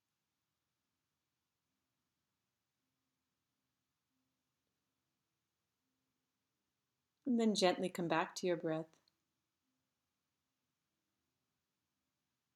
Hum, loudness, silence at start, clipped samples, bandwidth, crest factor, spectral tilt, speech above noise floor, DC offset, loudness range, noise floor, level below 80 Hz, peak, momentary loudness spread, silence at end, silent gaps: none; -37 LUFS; 7.25 s; under 0.1%; 13 kHz; 26 dB; -4.5 dB/octave; over 54 dB; under 0.1%; 9 LU; under -90 dBFS; under -90 dBFS; -18 dBFS; 11 LU; 3.7 s; none